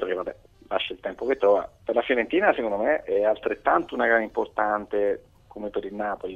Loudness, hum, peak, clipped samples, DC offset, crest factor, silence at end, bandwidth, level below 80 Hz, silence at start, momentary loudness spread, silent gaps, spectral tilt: -25 LUFS; none; -6 dBFS; under 0.1%; under 0.1%; 20 dB; 0 s; 6.8 kHz; -56 dBFS; 0 s; 10 LU; none; -6 dB/octave